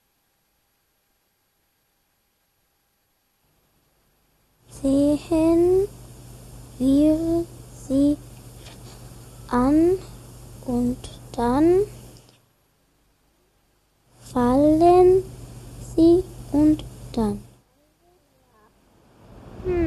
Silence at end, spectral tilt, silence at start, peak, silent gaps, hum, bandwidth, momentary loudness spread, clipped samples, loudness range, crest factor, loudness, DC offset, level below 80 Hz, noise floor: 0 s; -7.5 dB/octave; 4.75 s; -6 dBFS; none; none; 14 kHz; 26 LU; under 0.1%; 7 LU; 16 dB; -20 LUFS; under 0.1%; -44 dBFS; -69 dBFS